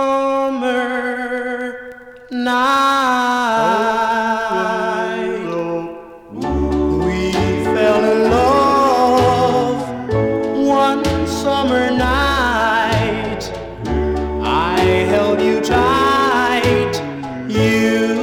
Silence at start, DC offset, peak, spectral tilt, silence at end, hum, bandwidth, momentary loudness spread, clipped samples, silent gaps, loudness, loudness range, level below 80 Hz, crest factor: 0 s; under 0.1%; -2 dBFS; -5.5 dB/octave; 0 s; none; 17.5 kHz; 10 LU; under 0.1%; none; -16 LUFS; 4 LU; -34 dBFS; 14 dB